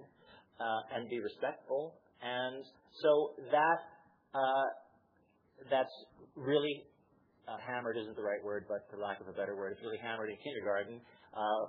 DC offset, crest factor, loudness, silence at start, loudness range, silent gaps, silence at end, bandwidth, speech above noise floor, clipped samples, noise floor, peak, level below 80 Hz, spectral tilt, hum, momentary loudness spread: under 0.1%; 20 dB; -37 LUFS; 0 s; 6 LU; none; 0 s; 5.2 kHz; 35 dB; under 0.1%; -72 dBFS; -18 dBFS; -84 dBFS; -2.5 dB/octave; none; 16 LU